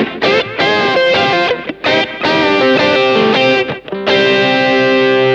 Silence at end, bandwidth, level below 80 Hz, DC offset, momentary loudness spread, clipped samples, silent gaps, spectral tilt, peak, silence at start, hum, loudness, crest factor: 0 s; 8 kHz; -52 dBFS; under 0.1%; 4 LU; under 0.1%; none; -5 dB/octave; 0 dBFS; 0 s; none; -11 LUFS; 12 dB